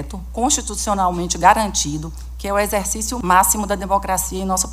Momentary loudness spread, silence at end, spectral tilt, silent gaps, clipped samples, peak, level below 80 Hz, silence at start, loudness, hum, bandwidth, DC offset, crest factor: 9 LU; 0 s; -3 dB/octave; none; under 0.1%; 0 dBFS; -32 dBFS; 0 s; -18 LUFS; none; 16 kHz; under 0.1%; 18 dB